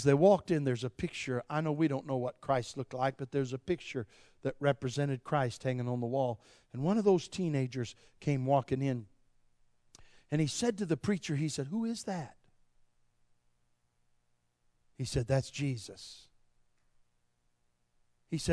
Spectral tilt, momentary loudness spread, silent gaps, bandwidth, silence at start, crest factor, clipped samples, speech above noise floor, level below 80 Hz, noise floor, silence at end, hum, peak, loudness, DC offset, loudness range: -6.5 dB/octave; 11 LU; none; 11 kHz; 0 s; 22 dB; under 0.1%; 42 dB; -62 dBFS; -75 dBFS; 0 s; 60 Hz at -60 dBFS; -14 dBFS; -34 LUFS; under 0.1%; 7 LU